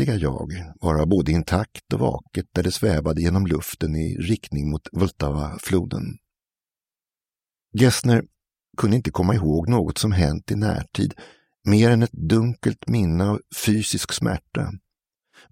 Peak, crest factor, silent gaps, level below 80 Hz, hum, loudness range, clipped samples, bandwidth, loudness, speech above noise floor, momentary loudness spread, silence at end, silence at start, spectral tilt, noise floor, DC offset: -2 dBFS; 20 dB; none; -38 dBFS; none; 5 LU; under 0.1%; 16.5 kHz; -22 LUFS; over 69 dB; 9 LU; 0.75 s; 0 s; -6 dB/octave; under -90 dBFS; under 0.1%